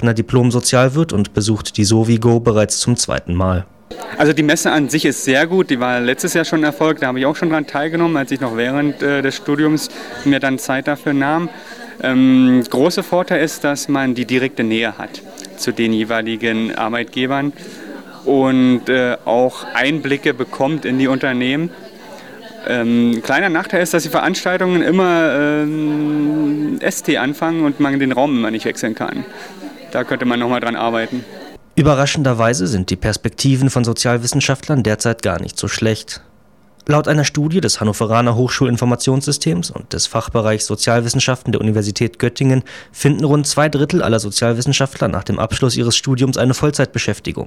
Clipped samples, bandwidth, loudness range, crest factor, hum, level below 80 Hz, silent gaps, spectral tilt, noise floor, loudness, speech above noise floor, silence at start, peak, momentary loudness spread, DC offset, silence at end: under 0.1%; 16 kHz; 3 LU; 16 dB; none; -44 dBFS; none; -5 dB/octave; -51 dBFS; -16 LUFS; 35 dB; 0 s; 0 dBFS; 9 LU; 0.3%; 0 s